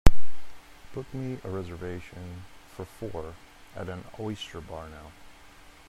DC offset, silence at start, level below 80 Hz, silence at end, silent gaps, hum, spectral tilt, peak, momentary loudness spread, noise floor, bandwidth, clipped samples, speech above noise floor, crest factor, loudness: under 0.1%; 0.05 s; -34 dBFS; 0 s; none; none; -6 dB/octave; 0 dBFS; 16 LU; -51 dBFS; 12.5 kHz; under 0.1%; 16 dB; 24 dB; -38 LUFS